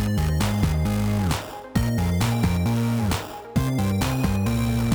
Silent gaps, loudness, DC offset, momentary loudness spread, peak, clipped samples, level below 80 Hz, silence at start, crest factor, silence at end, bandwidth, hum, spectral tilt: none; -24 LUFS; under 0.1%; 4 LU; -10 dBFS; under 0.1%; -32 dBFS; 0 s; 12 dB; 0 s; over 20 kHz; none; -6 dB/octave